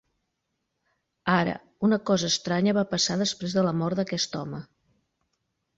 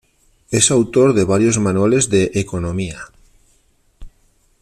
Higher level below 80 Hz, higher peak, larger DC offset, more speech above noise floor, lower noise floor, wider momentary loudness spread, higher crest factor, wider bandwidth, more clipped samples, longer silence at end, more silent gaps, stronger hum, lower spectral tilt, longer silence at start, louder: second, -62 dBFS vs -44 dBFS; second, -8 dBFS vs 0 dBFS; neither; first, 54 dB vs 42 dB; first, -79 dBFS vs -58 dBFS; about the same, 8 LU vs 10 LU; about the same, 20 dB vs 18 dB; second, 8 kHz vs 14 kHz; neither; first, 1.15 s vs 0.55 s; neither; neither; about the same, -4.5 dB/octave vs -4.5 dB/octave; first, 1.25 s vs 0.5 s; second, -26 LUFS vs -16 LUFS